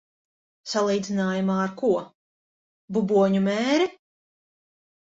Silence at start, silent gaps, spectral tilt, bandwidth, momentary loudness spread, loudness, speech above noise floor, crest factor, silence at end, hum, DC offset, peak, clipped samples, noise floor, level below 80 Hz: 0.65 s; 2.15-2.88 s; -6 dB/octave; 7.8 kHz; 8 LU; -24 LUFS; over 67 dB; 16 dB; 1.1 s; none; under 0.1%; -10 dBFS; under 0.1%; under -90 dBFS; -68 dBFS